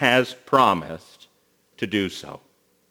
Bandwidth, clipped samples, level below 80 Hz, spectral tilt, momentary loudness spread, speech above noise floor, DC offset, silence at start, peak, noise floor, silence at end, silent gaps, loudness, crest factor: over 20 kHz; under 0.1%; -62 dBFS; -4.5 dB/octave; 21 LU; 42 dB; under 0.1%; 0 s; -2 dBFS; -64 dBFS; 0.55 s; none; -22 LUFS; 22 dB